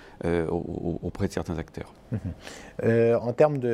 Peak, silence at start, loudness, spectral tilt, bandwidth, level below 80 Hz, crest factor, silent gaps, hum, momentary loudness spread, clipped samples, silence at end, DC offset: -6 dBFS; 0 s; -27 LUFS; -7.5 dB/octave; 13 kHz; -48 dBFS; 20 dB; none; none; 17 LU; under 0.1%; 0 s; under 0.1%